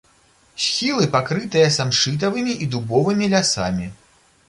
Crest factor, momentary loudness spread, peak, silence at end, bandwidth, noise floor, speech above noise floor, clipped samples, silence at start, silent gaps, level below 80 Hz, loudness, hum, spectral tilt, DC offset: 16 dB; 8 LU; -4 dBFS; 0.55 s; 11.5 kHz; -56 dBFS; 37 dB; under 0.1%; 0.55 s; none; -50 dBFS; -19 LUFS; none; -4 dB/octave; under 0.1%